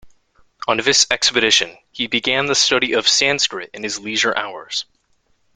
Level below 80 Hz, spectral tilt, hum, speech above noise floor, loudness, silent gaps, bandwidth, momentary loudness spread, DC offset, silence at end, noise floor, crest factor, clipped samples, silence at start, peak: -58 dBFS; -0.5 dB/octave; none; 44 dB; -16 LUFS; none; 12 kHz; 12 LU; under 0.1%; 0.7 s; -63 dBFS; 20 dB; under 0.1%; 0.05 s; 0 dBFS